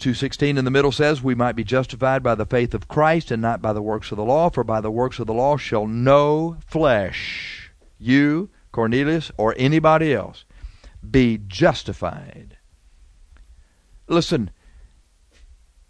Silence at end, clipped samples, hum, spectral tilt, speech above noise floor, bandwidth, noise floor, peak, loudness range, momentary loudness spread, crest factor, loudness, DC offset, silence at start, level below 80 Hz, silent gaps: 1.4 s; under 0.1%; none; -6.5 dB/octave; 36 dB; 11 kHz; -55 dBFS; -2 dBFS; 5 LU; 10 LU; 18 dB; -20 LUFS; under 0.1%; 0 s; -42 dBFS; none